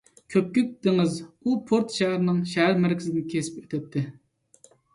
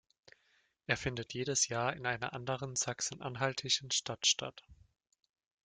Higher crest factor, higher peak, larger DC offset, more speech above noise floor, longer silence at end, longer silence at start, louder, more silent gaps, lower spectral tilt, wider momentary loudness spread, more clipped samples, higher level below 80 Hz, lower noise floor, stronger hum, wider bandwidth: second, 16 dB vs 24 dB; first, -8 dBFS vs -14 dBFS; neither; second, 33 dB vs 38 dB; about the same, 0.85 s vs 0.9 s; second, 0.3 s vs 0.9 s; first, -25 LUFS vs -34 LUFS; neither; first, -6 dB/octave vs -2 dB/octave; about the same, 9 LU vs 8 LU; neither; about the same, -66 dBFS vs -66 dBFS; second, -58 dBFS vs -74 dBFS; neither; about the same, 11.5 kHz vs 10.5 kHz